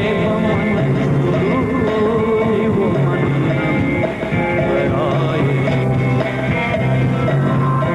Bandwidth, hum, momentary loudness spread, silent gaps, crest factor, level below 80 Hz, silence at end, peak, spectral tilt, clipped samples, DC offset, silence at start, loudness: 9.4 kHz; none; 2 LU; none; 8 dB; -38 dBFS; 0 s; -8 dBFS; -8.5 dB/octave; under 0.1%; under 0.1%; 0 s; -16 LUFS